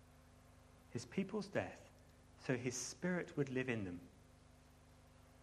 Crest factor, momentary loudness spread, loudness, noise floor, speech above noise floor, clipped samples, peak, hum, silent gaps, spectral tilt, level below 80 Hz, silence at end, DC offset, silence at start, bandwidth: 22 dB; 24 LU; -43 LUFS; -65 dBFS; 23 dB; under 0.1%; -24 dBFS; 50 Hz at -70 dBFS; none; -5 dB/octave; -70 dBFS; 0 s; under 0.1%; 0 s; 13.5 kHz